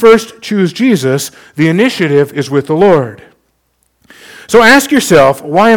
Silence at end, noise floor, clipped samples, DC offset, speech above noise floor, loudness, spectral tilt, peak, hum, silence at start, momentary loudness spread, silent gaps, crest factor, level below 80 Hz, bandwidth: 0 s; -59 dBFS; 2%; under 0.1%; 51 dB; -9 LUFS; -5 dB/octave; 0 dBFS; none; 0 s; 9 LU; none; 10 dB; -44 dBFS; 19 kHz